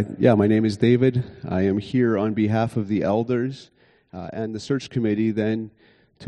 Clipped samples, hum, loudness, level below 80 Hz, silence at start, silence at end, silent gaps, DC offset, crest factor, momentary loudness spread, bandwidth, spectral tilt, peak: under 0.1%; none; -22 LUFS; -56 dBFS; 0 s; 0 s; none; under 0.1%; 20 dB; 12 LU; 9.8 kHz; -8 dB/octave; -2 dBFS